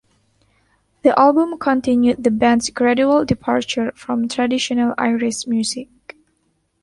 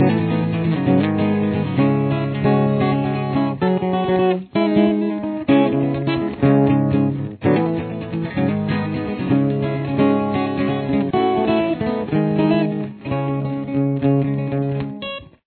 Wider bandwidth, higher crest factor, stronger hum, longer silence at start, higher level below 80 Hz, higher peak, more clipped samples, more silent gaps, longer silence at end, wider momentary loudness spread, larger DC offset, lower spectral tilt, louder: first, 11.5 kHz vs 4.5 kHz; about the same, 16 dB vs 16 dB; neither; first, 1.05 s vs 0 s; about the same, -52 dBFS vs -48 dBFS; about the same, -2 dBFS vs -2 dBFS; neither; neither; first, 1 s vs 0.2 s; about the same, 8 LU vs 7 LU; neither; second, -4.5 dB/octave vs -12 dB/octave; about the same, -17 LUFS vs -19 LUFS